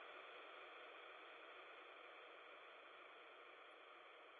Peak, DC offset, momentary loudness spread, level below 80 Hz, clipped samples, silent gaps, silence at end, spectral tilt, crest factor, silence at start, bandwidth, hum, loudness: -44 dBFS; under 0.1%; 4 LU; under -90 dBFS; under 0.1%; none; 0 s; 2.5 dB/octave; 16 dB; 0 s; 4.5 kHz; none; -59 LUFS